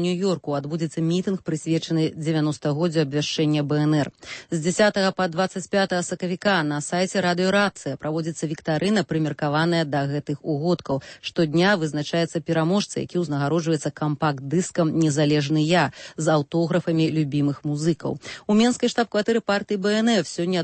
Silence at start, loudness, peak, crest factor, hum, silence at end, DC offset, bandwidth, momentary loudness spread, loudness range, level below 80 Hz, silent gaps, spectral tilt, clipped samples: 0 s; -23 LUFS; -6 dBFS; 16 dB; none; 0 s; under 0.1%; 8.8 kHz; 7 LU; 2 LU; -60 dBFS; none; -5.5 dB/octave; under 0.1%